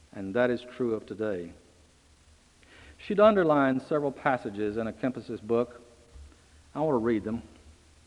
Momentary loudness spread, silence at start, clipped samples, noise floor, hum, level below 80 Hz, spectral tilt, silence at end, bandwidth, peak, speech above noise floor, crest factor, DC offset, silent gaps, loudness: 15 LU; 0.15 s; under 0.1%; -60 dBFS; none; -60 dBFS; -7.5 dB/octave; 0.35 s; 11 kHz; -8 dBFS; 32 dB; 22 dB; under 0.1%; none; -28 LUFS